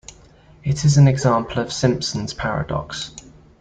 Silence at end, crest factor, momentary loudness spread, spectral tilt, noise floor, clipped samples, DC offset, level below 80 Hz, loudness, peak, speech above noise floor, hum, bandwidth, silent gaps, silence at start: 0.4 s; 18 dB; 15 LU; -5.5 dB/octave; -48 dBFS; under 0.1%; under 0.1%; -42 dBFS; -20 LUFS; -2 dBFS; 30 dB; none; 9.2 kHz; none; 0.65 s